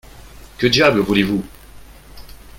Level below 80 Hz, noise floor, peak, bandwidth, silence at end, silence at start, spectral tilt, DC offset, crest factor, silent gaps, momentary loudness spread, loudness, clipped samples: -42 dBFS; -40 dBFS; 0 dBFS; 17 kHz; 0.2 s; 0.15 s; -5 dB/octave; under 0.1%; 20 dB; none; 11 LU; -16 LUFS; under 0.1%